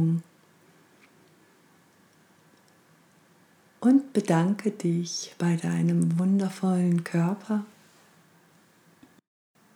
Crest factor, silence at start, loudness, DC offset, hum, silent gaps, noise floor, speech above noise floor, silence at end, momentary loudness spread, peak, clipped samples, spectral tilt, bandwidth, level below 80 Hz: 18 dB; 0 s; -26 LUFS; under 0.1%; none; none; -60 dBFS; 36 dB; 2.1 s; 9 LU; -10 dBFS; under 0.1%; -7 dB/octave; 11.5 kHz; -82 dBFS